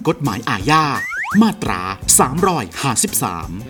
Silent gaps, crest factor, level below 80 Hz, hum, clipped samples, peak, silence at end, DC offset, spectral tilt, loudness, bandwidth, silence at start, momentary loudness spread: none; 18 dB; -40 dBFS; none; under 0.1%; 0 dBFS; 0 s; under 0.1%; -3.5 dB/octave; -16 LUFS; over 20 kHz; 0 s; 9 LU